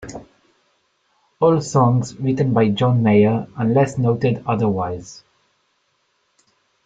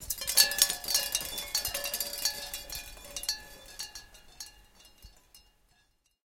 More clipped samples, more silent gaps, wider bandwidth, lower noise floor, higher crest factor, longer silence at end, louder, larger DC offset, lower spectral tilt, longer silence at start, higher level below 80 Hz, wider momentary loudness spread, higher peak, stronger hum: neither; neither; second, 8 kHz vs 17 kHz; second, -66 dBFS vs -71 dBFS; second, 16 dB vs 32 dB; first, 1.7 s vs 0.85 s; first, -18 LUFS vs -29 LUFS; neither; first, -7.5 dB/octave vs 1.5 dB/octave; about the same, 0 s vs 0 s; about the same, -54 dBFS vs -56 dBFS; second, 12 LU vs 23 LU; about the same, -2 dBFS vs -2 dBFS; neither